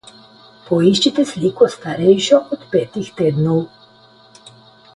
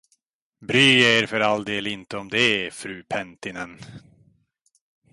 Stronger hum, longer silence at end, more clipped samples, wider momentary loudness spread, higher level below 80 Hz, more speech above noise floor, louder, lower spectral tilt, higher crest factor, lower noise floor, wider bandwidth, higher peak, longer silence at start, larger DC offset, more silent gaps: neither; first, 1.3 s vs 1.15 s; neither; second, 8 LU vs 20 LU; first, -56 dBFS vs -62 dBFS; second, 32 dB vs 47 dB; first, -16 LUFS vs -20 LUFS; first, -6 dB/octave vs -3.5 dB/octave; about the same, 18 dB vs 20 dB; second, -48 dBFS vs -69 dBFS; about the same, 11.5 kHz vs 11.5 kHz; first, 0 dBFS vs -4 dBFS; about the same, 0.7 s vs 0.6 s; neither; neither